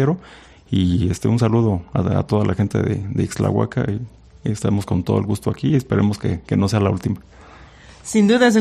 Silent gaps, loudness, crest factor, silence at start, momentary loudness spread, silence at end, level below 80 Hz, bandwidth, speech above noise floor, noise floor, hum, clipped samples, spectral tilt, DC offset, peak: none; -20 LUFS; 18 dB; 0 s; 9 LU; 0 s; -44 dBFS; 13.5 kHz; 25 dB; -43 dBFS; none; under 0.1%; -7 dB/octave; under 0.1%; -2 dBFS